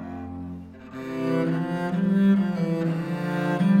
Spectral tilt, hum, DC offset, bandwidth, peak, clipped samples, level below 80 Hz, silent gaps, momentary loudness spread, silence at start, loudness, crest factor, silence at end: -8.5 dB/octave; none; under 0.1%; 9.6 kHz; -10 dBFS; under 0.1%; -58 dBFS; none; 16 LU; 0 s; -24 LUFS; 14 dB; 0 s